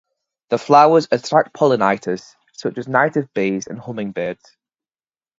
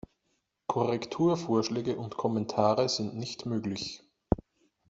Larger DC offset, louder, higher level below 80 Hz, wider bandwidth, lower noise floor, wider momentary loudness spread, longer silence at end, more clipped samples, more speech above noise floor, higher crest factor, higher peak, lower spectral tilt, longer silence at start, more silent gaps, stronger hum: neither; first, -18 LUFS vs -30 LUFS; second, -64 dBFS vs -54 dBFS; about the same, 7.8 kHz vs 8 kHz; first, under -90 dBFS vs -78 dBFS; first, 15 LU vs 10 LU; first, 1.05 s vs 0.5 s; neither; first, over 73 dB vs 48 dB; second, 18 dB vs 24 dB; first, 0 dBFS vs -6 dBFS; about the same, -5.5 dB/octave vs -5.5 dB/octave; second, 0.5 s vs 0.7 s; neither; neither